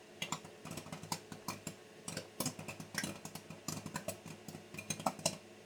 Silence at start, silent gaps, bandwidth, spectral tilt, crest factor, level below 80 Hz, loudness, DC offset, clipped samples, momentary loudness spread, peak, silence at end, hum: 0 s; none; over 20 kHz; -3 dB/octave; 30 dB; -74 dBFS; -43 LUFS; under 0.1%; under 0.1%; 10 LU; -16 dBFS; 0 s; none